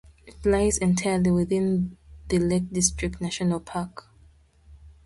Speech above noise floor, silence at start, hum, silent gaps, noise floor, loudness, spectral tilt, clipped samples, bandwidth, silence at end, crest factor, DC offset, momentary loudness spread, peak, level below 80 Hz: 32 dB; 0.25 s; none; none; -56 dBFS; -25 LUFS; -5 dB/octave; under 0.1%; 11.5 kHz; 0.15 s; 20 dB; under 0.1%; 9 LU; -6 dBFS; -42 dBFS